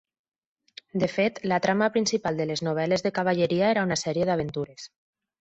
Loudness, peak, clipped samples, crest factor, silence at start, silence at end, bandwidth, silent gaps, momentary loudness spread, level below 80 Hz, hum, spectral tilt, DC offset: -25 LUFS; -10 dBFS; under 0.1%; 18 dB; 0.95 s; 0.7 s; 8.2 kHz; none; 11 LU; -62 dBFS; none; -5 dB/octave; under 0.1%